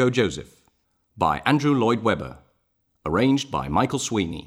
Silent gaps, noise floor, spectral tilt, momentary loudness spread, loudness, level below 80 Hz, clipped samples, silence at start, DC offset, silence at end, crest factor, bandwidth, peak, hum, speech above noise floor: none; -70 dBFS; -5.5 dB/octave; 8 LU; -23 LUFS; -48 dBFS; under 0.1%; 0 s; under 0.1%; 0 s; 20 dB; 14.5 kHz; -4 dBFS; none; 48 dB